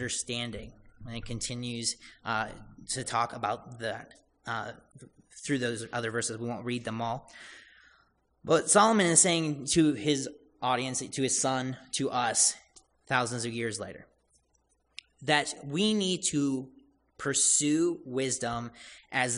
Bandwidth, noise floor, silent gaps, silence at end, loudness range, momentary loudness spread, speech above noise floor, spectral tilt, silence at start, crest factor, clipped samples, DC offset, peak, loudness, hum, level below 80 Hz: 11 kHz; -72 dBFS; none; 0 s; 9 LU; 20 LU; 42 dB; -3 dB/octave; 0 s; 24 dB; under 0.1%; under 0.1%; -6 dBFS; -29 LUFS; none; -60 dBFS